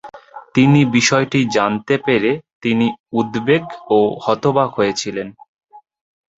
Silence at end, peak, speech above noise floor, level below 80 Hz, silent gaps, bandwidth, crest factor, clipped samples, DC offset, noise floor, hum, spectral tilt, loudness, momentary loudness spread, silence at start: 0.6 s; -2 dBFS; 21 dB; -54 dBFS; 2.55-2.61 s, 2.99-3.04 s, 5.48-5.57 s; 8 kHz; 16 dB; under 0.1%; under 0.1%; -37 dBFS; none; -5.5 dB/octave; -16 LUFS; 9 LU; 0.05 s